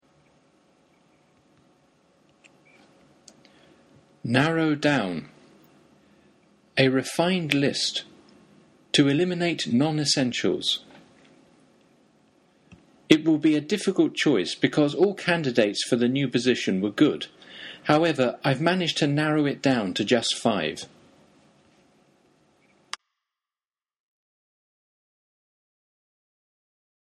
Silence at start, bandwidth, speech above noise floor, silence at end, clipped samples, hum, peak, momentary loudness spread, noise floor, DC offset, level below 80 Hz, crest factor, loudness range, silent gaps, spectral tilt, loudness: 4.25 s; 12.5 kHz; over 67 dB; 6.15 s; under 0.1%; none; 0 dBFS; 11 LU; under -90 dBFS; under 0.1%; -68 dBFS; 26 dB; 5 LU; none; -5 dB/octave; -23 LUFS